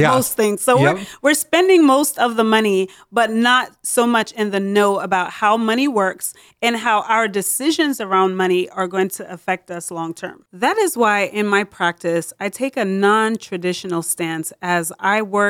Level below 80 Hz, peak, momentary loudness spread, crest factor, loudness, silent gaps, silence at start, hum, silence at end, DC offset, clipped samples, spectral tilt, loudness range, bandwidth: -64 dBFS; -4 dBFS; 9 LU; 14 dB; -18 LUFS; none; 0 s; none; 0 s; under 0.1%; under 0.1%; -4 dB/octave; 5 LU; 18 kHz